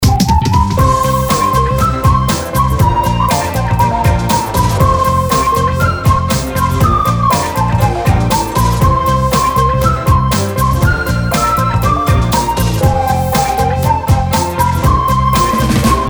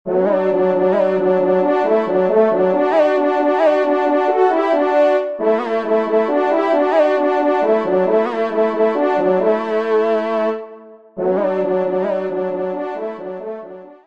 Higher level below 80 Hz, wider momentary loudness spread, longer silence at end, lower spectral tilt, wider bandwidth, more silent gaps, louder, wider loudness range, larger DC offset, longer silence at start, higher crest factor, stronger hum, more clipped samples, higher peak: first, -20 dBFS vs -66 dBFS; second, 2 LU vs 9 LU; second, 0 s vs 0.15 s; second, -5.5 dB/octave vs -7.5 dB/octave; first, over 20 kHz vs 7.4 kHz; neither; first, -12 LUFS vs -16 LUFS; second, 1 LU vs 4 LU; second, under 0.1% vs 0.3%; about the same, 0 s vs 0.05 s; about the same, 12 dB vs 14 dB; neither; neither; about the same, 0 dBFS vs -2 dBFS